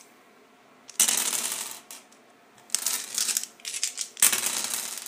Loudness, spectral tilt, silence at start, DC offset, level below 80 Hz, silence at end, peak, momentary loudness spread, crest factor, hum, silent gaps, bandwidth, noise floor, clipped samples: -25 LUFS; 2.5 dB/octave; 0.9 s; under 0.1%; -86 dBFS; 0 s; 0 dBFS; 14 LU; 30 dB; none; none; 16 kHz; -56 dBFS; under 0.1%